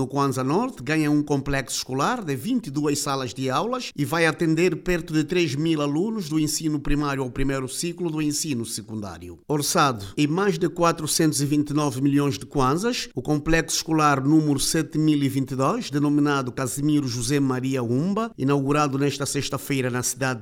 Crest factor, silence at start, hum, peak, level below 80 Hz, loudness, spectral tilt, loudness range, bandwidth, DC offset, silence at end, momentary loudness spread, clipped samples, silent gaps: 18 dB; 0 s; none; -6 dBFS; -42 dBFS; -23 LUFS; -5 dB/octave; 3 LU; 16.5 kHz; under 0.1%; 0 s; 6 LU; under 0.1%; none